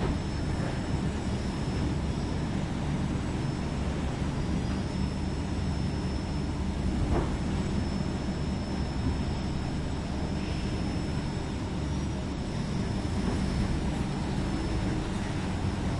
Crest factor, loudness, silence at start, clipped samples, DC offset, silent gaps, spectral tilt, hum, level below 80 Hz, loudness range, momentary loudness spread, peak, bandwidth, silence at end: 16 dB; -31 LUFS; 0 s; under 0.1%; under 0.1%; none; -6.5 dB/octave; none; -36 dBFS; 1 LU; 3 LU; -14 dBFS; 11.5 kHz; 0 s